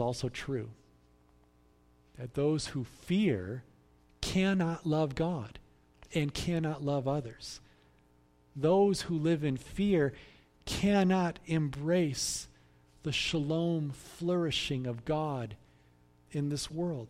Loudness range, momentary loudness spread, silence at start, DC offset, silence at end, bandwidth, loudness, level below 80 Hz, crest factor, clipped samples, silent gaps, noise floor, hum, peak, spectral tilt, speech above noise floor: 5 LU; 14 LU; 0 s; under 0.1%; 0 s; 15.5 kHz; -32 LUFS; -56 dBFS; 16 dB; under 0.1%; none; -65 dBFS; none; -16 dBFS; -5.5 dB/octave; 34 dB